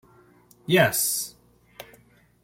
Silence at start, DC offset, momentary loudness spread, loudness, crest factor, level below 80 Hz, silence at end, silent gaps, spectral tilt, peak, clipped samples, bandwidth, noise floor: 0.7 s; under 0.1%; 26 LU; -22 LUFS; 24 dB; -64 dBFS; 0.6 s; none; -3.5 dB/octave; -4 dBFS; under 0.1%; 16.5 kHz; -57 dBFS